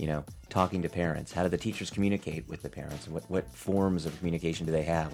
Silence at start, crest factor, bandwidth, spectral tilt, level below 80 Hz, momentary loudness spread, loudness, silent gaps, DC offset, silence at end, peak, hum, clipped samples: 0 s; 22 dB; 16 kHz; -6.5 dB/octave; -50 dBFS; 10 LU; -32 LUFS; none; under 0.1%; 0 s; -10 dBFS; none; under 0.1%